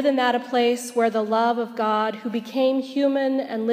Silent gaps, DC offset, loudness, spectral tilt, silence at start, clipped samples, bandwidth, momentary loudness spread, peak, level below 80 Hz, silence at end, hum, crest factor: none; under 0.1%; -22 LUFS; -4.5 dB/octave; 0 s; under 0.1%; 15.5 kHz; 4 LU; -6 dBFS; -84 dBFS; 0 s; none; 16 dB